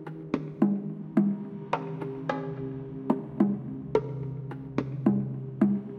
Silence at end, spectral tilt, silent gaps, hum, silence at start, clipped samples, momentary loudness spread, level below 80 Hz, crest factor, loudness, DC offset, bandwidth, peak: 0 s; -9.5 dB/octave; none; none; 0 s; under 0.1%; 9 LU; -62 dBFS; 20 dB; -30 LUFS; under 0.1%; 6 kHz; -10 dBFS